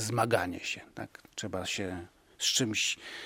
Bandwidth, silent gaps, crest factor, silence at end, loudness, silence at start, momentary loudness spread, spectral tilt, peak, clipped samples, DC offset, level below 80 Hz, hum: 16.5 kHz; none; 22 dB; 0 s; -31 LUFS; 0 s; 15 LU; -2.5 dB/octave; -12 dBFS; under 0.1%; under 0.1%; -64 dBFS; none